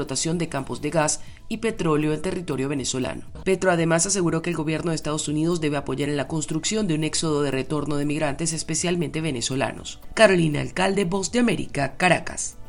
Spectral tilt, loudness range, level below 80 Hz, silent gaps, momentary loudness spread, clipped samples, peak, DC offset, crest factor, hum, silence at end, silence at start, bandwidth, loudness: -4.5 dB/octave; 3 LU; -44 dBFS; none; 8 LU; under 0.1%; 0 dBFS; under 0.1%; 22 dB; none; 0 s; 0 s; 17 kHz; -23 LUFS